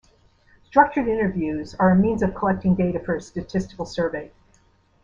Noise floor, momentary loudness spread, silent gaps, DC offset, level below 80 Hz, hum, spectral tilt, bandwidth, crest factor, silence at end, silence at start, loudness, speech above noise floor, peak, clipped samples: -59 dBFS; 10 LU; none; under 0.1%; -46 dBFS; none; -8 dB/octave; 7.4 kHz; 20 dB; 0.75 s; 0.75 s; -22 LUFS; 38 dB; -2 dBFS; under 0.1%